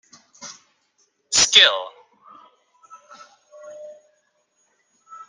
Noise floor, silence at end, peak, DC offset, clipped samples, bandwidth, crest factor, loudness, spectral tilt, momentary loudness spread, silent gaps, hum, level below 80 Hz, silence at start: -67 dBFS; 0.15 s; 0 dBFS; under 0.1%; under 0.1%; 10 kHz; 24 dB; -14 LUFS; 2 dB/octave; 28 LU; none; none; -62 dBFS; 0.4 s